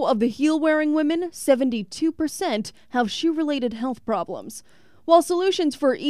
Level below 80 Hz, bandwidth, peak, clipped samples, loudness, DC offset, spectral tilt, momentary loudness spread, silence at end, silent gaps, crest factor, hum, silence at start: -60 dBFS; 15 kHz; -4 dBFS; under 0.1%; -22 LUFS; 0.3%; -4 dB/octave; 10 LU; 0 s; none; 18 dB; none; 0 s